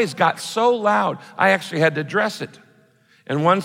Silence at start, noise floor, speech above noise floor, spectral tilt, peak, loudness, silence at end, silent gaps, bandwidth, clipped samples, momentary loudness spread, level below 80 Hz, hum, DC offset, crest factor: 0 s; -56 dBFS; 37 dB; -5 dB/octave; -4 dBFS; -20 LUFS; 0 s; none; 16.5 kHz; under 0.1%; 8 LU; -74 dBFS; none; under 0.1%; 16 dB